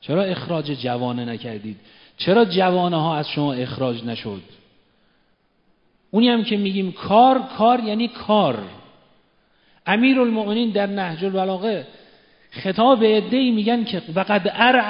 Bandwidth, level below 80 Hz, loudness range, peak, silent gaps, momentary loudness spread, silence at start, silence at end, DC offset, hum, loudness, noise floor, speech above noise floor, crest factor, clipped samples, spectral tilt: 5.4 kHz; -64 dBFS; 5 LU; 0 dBFS; none; 14 LU; 0.05 s; 0 s; under 0.1%; none; -20 LUFS; -63 dBFS; 44 dB; 20 dB; under 0.1%; -11 dB/octave